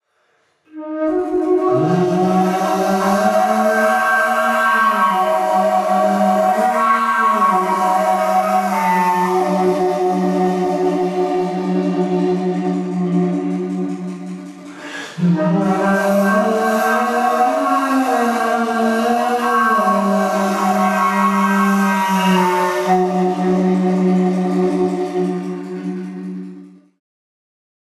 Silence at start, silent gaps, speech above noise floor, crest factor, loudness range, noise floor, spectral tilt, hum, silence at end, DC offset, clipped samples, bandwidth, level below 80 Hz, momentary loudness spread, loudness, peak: 0.75 s; none; 46 dB; 14 dB; 5 LU; -61 dBFS; -6 dB/octave; none; 1.3 s; under 0.1%; under 0.1%; 14 kHz; -64 dBFS; 8 LU; -16 LUFS; -4 dBFS